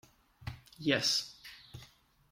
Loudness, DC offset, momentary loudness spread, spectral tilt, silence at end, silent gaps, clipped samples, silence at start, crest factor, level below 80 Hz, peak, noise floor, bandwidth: -31 LUFS; under 0.1%; 23 LU; -3 dB/octave; 0.45 s; none; under 0.1%; 0.4 s; 22 dB; -64 dBFS; -16 dBFS; -62 dBFS; 16.5 kHz